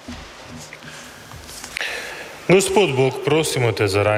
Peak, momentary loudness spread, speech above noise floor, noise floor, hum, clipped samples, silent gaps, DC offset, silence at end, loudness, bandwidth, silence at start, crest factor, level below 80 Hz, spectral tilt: -4 dBFS; 20 LU; 21 dB; -38 dBFS; none; under 0.1%; none; under 0.1%; 0 s; -19 LUFS; 16 kHz; 0.05 s; 18 dB; -50 dBFS; -4.5 dB/octave